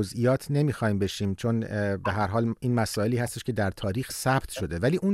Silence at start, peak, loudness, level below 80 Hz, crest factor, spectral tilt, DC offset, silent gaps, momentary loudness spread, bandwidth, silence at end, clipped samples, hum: 0 s; -10 dBFS; -27 LUFS; -50 dBFS; 16 dB; -6 dB/octave; under 0.1%; none; 4 LU; 16 kHz; 0 s; under 0.1%; none